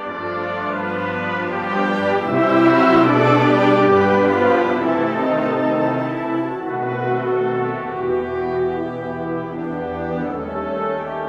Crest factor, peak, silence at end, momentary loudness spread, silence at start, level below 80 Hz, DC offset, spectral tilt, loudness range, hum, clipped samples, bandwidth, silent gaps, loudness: 16 dB; -2 dBFS; 0 s; 11 LU; 0 s; -52 dBFS; under 0.1%; -7.5 dB/octave; 8 LU; none; under 0.1%; 7.6 kHz; none; -19 LUFS